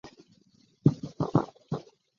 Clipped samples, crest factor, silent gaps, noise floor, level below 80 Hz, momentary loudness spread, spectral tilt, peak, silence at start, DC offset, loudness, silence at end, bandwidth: under 0.1%; 26 dB; none; -64 dBFS; -60 dBFS; 11 LU; -9 dB/octave; -6 dBFS; 0.05 s; under 0.1%; -30 LUFS; 0.35 s; 7.2 kHz